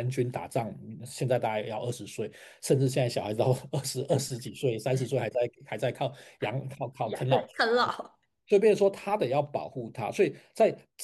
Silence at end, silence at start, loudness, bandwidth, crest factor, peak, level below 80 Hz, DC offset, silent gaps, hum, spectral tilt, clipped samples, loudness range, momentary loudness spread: 0 s; 0 s; -29 LUFS; 12.5 kHz; 18 dB; -10 dBFS; -72 dBFS; under 0.1%; none; none; -5.5 dB/octave; under 0.1%; 4 LU; 12 LU